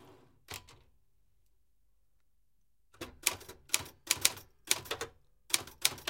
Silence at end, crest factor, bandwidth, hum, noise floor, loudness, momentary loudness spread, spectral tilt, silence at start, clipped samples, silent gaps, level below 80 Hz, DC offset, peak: 0 s; 38 dB; 17 kHz; none; -78 dBFS; -33 LUFS; 18 LU; 0.5 dB/octave; 0 s; under 0.1%; none; -66 dBFS; under 0.1%; 0 dBFS